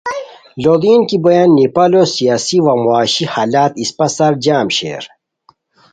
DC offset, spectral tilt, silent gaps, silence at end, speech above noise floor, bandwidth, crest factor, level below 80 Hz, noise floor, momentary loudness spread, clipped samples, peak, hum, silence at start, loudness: under 0.1%; -5 dB/octave; none; 0.85 s; 41 dB; 9.4 kHz; 12 dB; -54 dBFS; -53 dBFS; 13 LU; under 0.1%; 0 dBFS; none; 0.05 s; -12 LUFS